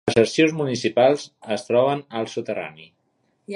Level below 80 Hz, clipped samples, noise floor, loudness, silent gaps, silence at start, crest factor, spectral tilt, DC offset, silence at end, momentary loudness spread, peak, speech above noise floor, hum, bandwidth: -62 dBFS; under 0.1%; -68 dBFS; -21 LUFS; none; 0.05 s; 20 dB; -5 dB/octave; under 0.1%; 0 s; 11 LU; -2 dBFS; 47 dB; none; 11.5 kHz